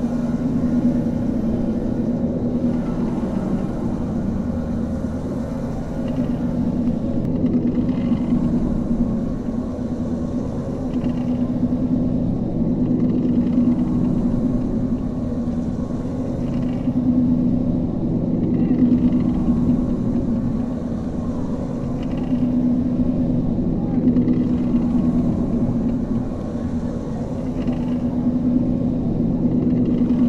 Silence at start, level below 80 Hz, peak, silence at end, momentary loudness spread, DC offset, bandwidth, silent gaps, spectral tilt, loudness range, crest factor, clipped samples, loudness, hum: 0 s; -32 dBFS; -6 dBFS; 0 s; 7 LU; under 0.1%; 7 kHz; none; -10 dB/octave; 3 LU; 14 dB; under 0.1%; -21 LUFS; none